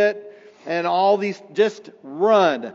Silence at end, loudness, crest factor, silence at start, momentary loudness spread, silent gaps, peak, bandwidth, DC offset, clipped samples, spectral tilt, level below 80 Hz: 0 s; -20 LUFS; 16 dB; 0 s; 20 LU; none; -4 dBFS; 7.6 kHz; under 0.1%; under 0.1%; -3 dB/octave; -88 dBFS